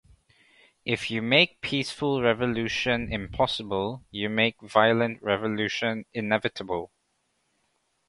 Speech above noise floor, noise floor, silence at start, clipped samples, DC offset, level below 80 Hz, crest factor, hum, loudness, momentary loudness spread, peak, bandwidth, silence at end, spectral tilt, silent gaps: 47 dB; -74 dBFS; 0.85 s; under 0.1%; under 0.1%; -54 dBFS; 22 dB; none; -26 LUFS; 11 LU; -4 dBFS; 11.5 kHz; 1.2 s; -5 dB/octave; none